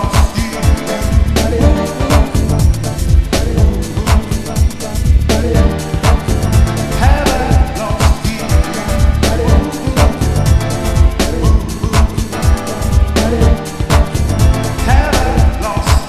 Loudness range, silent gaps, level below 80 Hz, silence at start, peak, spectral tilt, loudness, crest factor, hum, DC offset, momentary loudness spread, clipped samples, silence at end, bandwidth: 1 LU; none; -14 dBFS; 0 s; 0 dBFS; -5.5 dB/octave; -14 LUFS; 12 dB; none; under 0.1%; 4 LU; under 0.1%; 0 s; 14 kHz